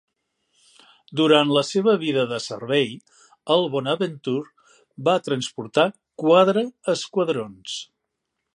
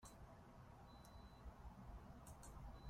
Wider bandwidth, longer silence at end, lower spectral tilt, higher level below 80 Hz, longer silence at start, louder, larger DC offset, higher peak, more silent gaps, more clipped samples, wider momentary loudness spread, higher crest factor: second, 11 kHz vs 16 kHz; first, 0.7 s vs 0 s; about the same, -5 dB/octave vs -5.5 dB/octave; second, -72 dBFS vs -62 dBFS; first, 1.1 s vs 0 s; first, -22 LUFS vs -61 LUFS; neither; first, -2 dBFS vs -44 dBFS; neither; neither; first, 15 LU vs 4 LU; first, 20 dB vs 14 dB